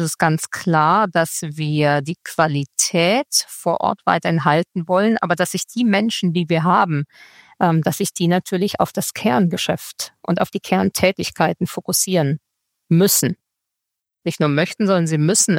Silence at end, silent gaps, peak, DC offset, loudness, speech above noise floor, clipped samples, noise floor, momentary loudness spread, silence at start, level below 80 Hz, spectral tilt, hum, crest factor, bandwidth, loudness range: 0 s; none; 0 dBFS; under 0.1%; -18 LUFS; 64 dB; under 0.1%; -82 dBFS; 7 LU; 0 s; -58 dBFS; -4.5 dB/octave; none; 18 dB; 17 kHz; 2 LU